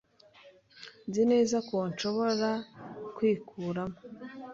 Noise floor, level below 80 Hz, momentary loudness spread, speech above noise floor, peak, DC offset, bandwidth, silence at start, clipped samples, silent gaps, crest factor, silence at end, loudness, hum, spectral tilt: -58 dBFS; -70 dBFS; 19 LU; 28 dB; -16 dBFS; under 0.1%; 7.8 kHz; 0.45 s; under 0.1%; none; 16 dB; 0 s; -30 LUFS; none; -5.5 dB/octave